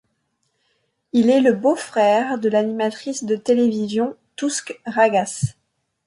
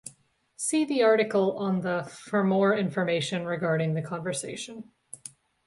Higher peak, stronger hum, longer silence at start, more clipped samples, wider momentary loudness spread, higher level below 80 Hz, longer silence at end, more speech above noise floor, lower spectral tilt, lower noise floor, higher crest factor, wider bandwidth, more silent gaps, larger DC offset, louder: first, -4 dBFS vs -10 dBFS; neither; first, 1.15 s vs 0.05 s; neither; second, 11 LU vs 20 LU; first, -60 dBFS vs -70 dBFS; first, 0.55 s vs 0.4 s; first, 52 dB vs 36 dB; about the same, -5 dB/octave vs -5 dB/octave; first, -71 dBFS vs -62 dBFS; about the same, 16 dB vs 16 dB; about the same, 11.5 kHz vs 11.5 kHz; neither; neither; first, -20 LUFS vs -27 LUFS